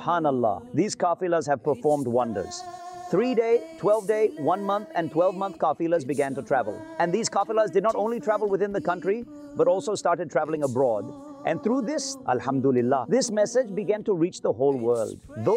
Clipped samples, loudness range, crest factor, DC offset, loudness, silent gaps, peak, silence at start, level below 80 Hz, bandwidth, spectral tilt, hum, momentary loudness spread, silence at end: under 0.1%; 1 LU; 14 dB; under 0.1%; -25 LUFS; none; -12 dBFS; 0 s; -66 dBFS; 13.5 kHz; -5.5 dB/octave; none; 6 LU; 0 s